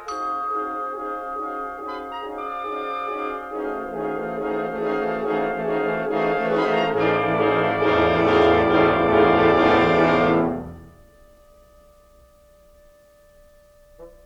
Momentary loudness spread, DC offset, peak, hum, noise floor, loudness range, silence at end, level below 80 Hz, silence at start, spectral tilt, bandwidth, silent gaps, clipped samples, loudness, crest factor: 13 LU; under 0.1%; -4 dBFS; none; -53 dBFS; 11 LU; 0.15 s; -48 dBFS; 0 s; -7 dB/octave; 7.8 kHz; none; under 0.1%; -21 LUFS; 18 dB